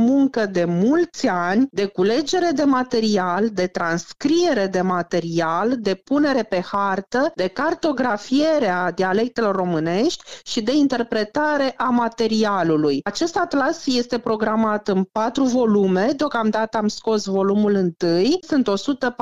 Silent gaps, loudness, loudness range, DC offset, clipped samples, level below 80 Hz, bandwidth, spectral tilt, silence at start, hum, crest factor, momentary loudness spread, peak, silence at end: none; -20 LUFS; 1 LU; 0.4%; under 0.1%; -60 dBFS; 9.2 kHz; -5.5 dB/octave; 0 s; none; 12 dB; 4 LU; -8 dBFS; 0.1 s